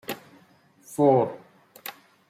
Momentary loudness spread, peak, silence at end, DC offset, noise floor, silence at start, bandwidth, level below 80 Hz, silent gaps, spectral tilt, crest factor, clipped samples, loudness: 20 LU; -8 dBFS; 0.4 s; under 0.1%; -58 dBFS; 0.1 s; 16.5 kHz; -72 dBFS; none; -6.5 dB/octave; 20 dB; under 0.1%; -22 LUFS